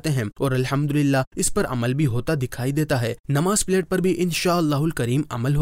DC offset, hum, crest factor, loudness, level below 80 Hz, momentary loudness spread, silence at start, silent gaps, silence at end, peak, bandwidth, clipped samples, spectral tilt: under 0.1%; none; 10 dB; -22 LUFS; -42 dBFS; 4 LU; 0.05 s; 1.27-1.31 s, 3.20-3.24 s; 0 s; -10 dBFS; 16 kHz; under 0.1%; -5.5 dB/octave